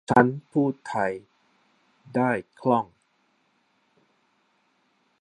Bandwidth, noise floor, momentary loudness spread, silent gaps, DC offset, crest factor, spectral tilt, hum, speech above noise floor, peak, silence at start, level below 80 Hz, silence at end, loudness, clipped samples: 10 kHz; -69 dBFS; 10 LU; none; under 0.1%; 26 dB; -7.5 dB/octave; none; 45 dB; -2 dBFS; 0.1 s; -66 dBFS; 2.35 s; -25 LUFS; under 0.1%